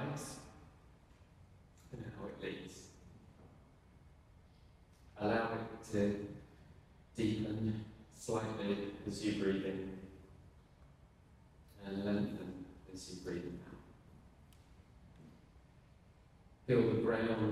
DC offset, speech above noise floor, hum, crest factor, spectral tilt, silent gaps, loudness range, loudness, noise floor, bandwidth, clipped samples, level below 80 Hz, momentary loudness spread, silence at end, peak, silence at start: under 0.1%; 26 dB; none; 22 dB; -6.5 dB/octave; none; 12 LU; -39 LUFS; -63 dBFS; 13.5 kHz; under 0.1%; -64 dBFS; 26 LU; 0 s; -20 dBFS; 0 s